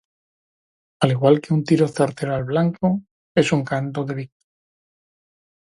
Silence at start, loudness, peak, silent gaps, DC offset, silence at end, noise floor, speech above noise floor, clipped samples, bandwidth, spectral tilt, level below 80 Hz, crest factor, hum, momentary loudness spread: 1 s; -21 LUFS; 0 dBFS; 3.11-3.35 s; under 0.1%; 1.55 s; under -90 dBFS; over 71 dB; under 0.1%; 11.5 kHz; -7 dB/octave; -58 dBFS; 22 dB; none; 10 LU